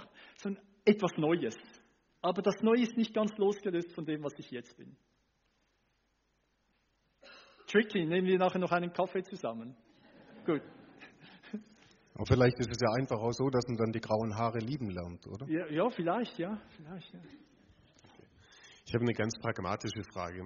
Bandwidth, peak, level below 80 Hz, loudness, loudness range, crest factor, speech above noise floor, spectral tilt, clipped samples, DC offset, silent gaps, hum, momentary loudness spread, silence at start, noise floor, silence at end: 7.2 kHz; -12 dBFS; -62 dBFS; -33 LUFS; 8 LU; 22 dB; 44 dB; -5.5 dB/octave; under 0.1%; under 0.1%; none; none; 19 LU; 0 s; -76 dBFS; 0 s